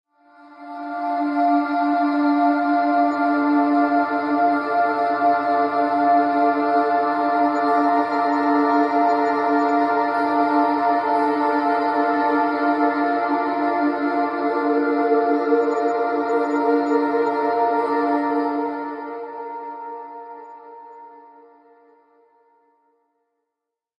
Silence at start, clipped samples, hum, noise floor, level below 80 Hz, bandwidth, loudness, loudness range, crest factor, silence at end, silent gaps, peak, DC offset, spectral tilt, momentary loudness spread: 0.45 s; under 0.1%; none; -83 dBFS; -72 dBFS; 7.4 kHz; -20 LUFS; 7 LU; 14 dB; 2.85 s; none; -6 dBFS; under 0.1%; -6 dB/octave; 11 LU